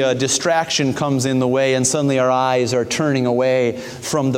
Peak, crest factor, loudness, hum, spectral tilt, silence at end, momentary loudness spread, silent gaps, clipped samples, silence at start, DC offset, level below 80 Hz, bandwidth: -4 dBFS; 14 dB; -18 LUFS; none; -4 dB/octave; 0 s; 3 LU; none; under 0.1%; 0 s; under 0.1%; -56 dBFS; 16 kHz